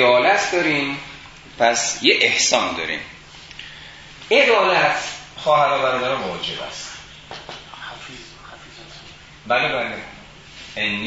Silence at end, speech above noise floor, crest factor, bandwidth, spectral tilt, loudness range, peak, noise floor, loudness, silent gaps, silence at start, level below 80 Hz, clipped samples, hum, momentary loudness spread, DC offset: 0 s; 23 dB; 20 dB; 8 kHz; -2 dB/octave; 10 LU; 0 dBFS; -42 dBFS; -18 LUFS; none; 0 s; -52 dBFS; under 0.1%; none; 24 LU; under 0.1%